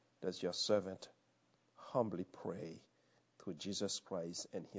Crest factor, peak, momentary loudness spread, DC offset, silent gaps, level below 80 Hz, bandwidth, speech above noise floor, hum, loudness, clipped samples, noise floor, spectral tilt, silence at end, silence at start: 22 dB; -22 dBFS; 17 LU; under 0.1%; none; -76 dBFS; 8 kHz; 35 dB; none; -42 LUFS; under 0.1%; -77 dBFS; -4 dB/octave; 0 s; 0.2 s